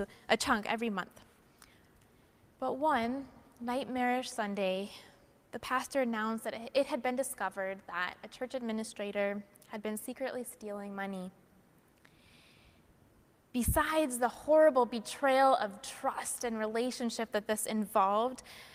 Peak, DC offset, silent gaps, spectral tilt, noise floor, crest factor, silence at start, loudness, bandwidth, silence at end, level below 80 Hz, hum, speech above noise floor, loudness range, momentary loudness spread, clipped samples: -12 dBFS; under 0.1%; none; -4 dB/octave; -65 dBFS; 22 dB; 0 s; -33 LUFS; 16 kHz; 0 s; -56 dBFS; none; 32 dB; 10 LU; 14 LU; under 0.1%